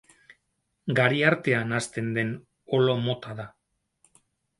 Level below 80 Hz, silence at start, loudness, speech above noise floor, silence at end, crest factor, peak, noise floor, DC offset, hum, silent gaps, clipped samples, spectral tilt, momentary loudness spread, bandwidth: -66 dBFS; 0.85 s; -25 LUFS; 51 dB; 1.1 s; 22 dB; -4 dBFS; -76 dBFS; under 0.1%; none; none; under 0.1%; -5.5 dB/octave; 17 LU; 11.5 kHz